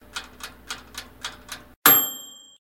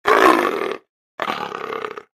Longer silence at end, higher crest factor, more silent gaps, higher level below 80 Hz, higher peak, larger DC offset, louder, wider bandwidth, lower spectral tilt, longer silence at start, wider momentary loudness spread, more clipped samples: first, 0.3 s vs 0.15 s; first, 26 dB vs 20 dB; second, 1.76-1.82 s vs 0.89-1.18 s; about the same, -56 dBFS vs -58 dBFS; about the same, 0 dBFS vs 0 dBFS; neither; first, -17 LUFS vs -20 LUFS; about the same, 17 kHz vs 15.5 kHz; second, -0.5 dB/octave vs -3.5 dB/octave; about the same, 0.15 s vs 0.05 s; first, 25 LU vs 15 LU; neither